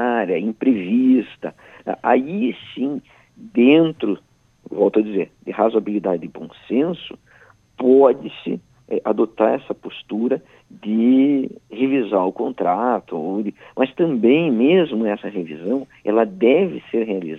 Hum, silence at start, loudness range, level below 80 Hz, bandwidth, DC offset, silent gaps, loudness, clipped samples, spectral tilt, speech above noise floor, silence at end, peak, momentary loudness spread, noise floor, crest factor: none; 0 s; 2 LU; -66 dBFS; 4 kHz; under 0.1%; none; -19 LUFS; under 0.1%; -8.5 dB/octave; 33 dB; 0 s; 0 dBFS; 14 LU; -51 dBFS; 18 dB